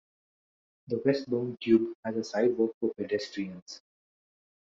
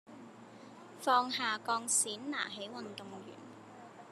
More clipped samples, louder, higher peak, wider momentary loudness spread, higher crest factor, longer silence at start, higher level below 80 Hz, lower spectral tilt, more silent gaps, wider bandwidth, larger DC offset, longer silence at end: neither; first, -30 LUFS vs -33 LUFS; first, -10 dBFS vs -16 dBFS; second, 13 LU vs 23 LU; about the same, 20 dB vs 22 dB; first, 0.9 s vs 0.1 s; first, -74 dBFS vs under -90 dBFS; first, -6.5 dB/octave vs -1 dB/octave; first, 1.95-2.03 s, 2.74-2.81 s, 3.62-3.66 s vs none; second, 7.6 kHz vs 13 kHz; neither; first, 0.9 s vs 0 s